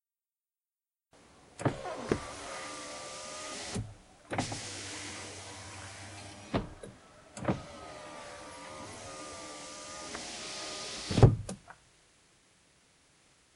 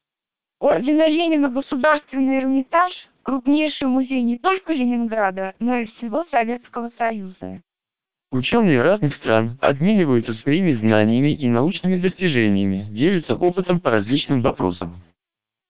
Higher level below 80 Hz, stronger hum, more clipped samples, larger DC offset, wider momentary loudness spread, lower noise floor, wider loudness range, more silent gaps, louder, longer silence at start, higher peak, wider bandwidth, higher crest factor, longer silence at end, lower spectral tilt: about the same, -50 dBFS vs -52 dBFS; neither; neither; second, under 0.1% vs 0.7%; first, 12 LU vs 8 LU; about the same, under -90 dBFS vs -88 dBFS; first, 9 LU vs 5 LU; neither; second, -36 LUFS vs -19 LUFS; first, 1.15 s vs 0 s; second, -6 dBFS vs -2 dBFS; first, 11.5 kHz vs 4 kHz; first, 30 dB vs 18 dB; first, 1.8 s vs 0 s; second, -5 dB/octave vs -11 dB/octave